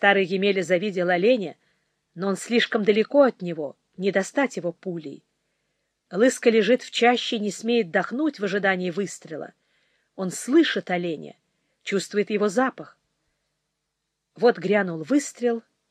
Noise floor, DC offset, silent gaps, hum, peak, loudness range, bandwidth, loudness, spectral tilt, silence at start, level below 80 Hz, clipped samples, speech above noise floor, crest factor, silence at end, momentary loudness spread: -79 dBFS; under 0.1%; none; none; -4 dBFS; 5 LU; 14.5 kHz; -23 LUFS; -4.5 dB/octave; 0 s; -84 dBFS; under 0.1%; 57 dB; 20 dB; 0.3 s; 14 LU